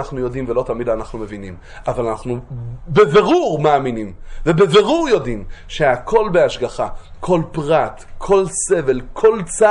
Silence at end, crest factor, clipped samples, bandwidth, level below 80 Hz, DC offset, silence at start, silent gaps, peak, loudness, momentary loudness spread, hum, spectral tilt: 0 s; 16 dB; under 0.1%; 11 kHz; -38 dBFS; under 0.1%; 0 s; none; 0 dBFS; -17 LUFS; 17 LU; none; -5 dB/octave